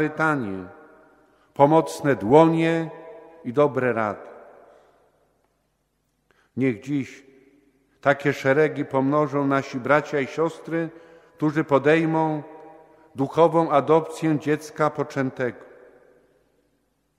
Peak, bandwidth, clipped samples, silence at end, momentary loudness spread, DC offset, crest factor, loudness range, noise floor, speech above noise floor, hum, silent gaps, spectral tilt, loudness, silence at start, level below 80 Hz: -2 dBFS; 14 kHz; under 0.1%; 1.65 s; 16 LU; under 0.1%; 22 dB; 9 LU; -71 dBFS; 50 dB; none; none; -7 dB/octave; -22 LUFS; 0 s; -66 dBFS